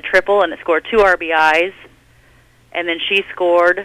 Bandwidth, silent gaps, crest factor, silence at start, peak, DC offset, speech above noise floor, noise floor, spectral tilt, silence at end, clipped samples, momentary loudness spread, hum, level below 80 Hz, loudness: 14.5 kHz; none; 14 dB; 0.05 s; -2 dBFS; under 0.1%; 35 dB; -50 dBFS; -3.5 dB/octave; 0 s; under 0.1%; 9 LU; none; -46 dBFS; -15 LUFS